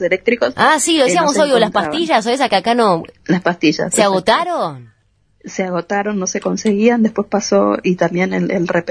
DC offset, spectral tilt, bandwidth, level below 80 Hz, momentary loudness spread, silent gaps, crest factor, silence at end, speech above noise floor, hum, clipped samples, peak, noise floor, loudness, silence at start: under 0.1%; -4 dB/octave; 11 kHz; -54 dBFS; 7 LU; none; 16 dB; 0 s; 42 dB; none; under 0.1%; 0 dBFS; -57 dBFS; -15 LUFS; 0 s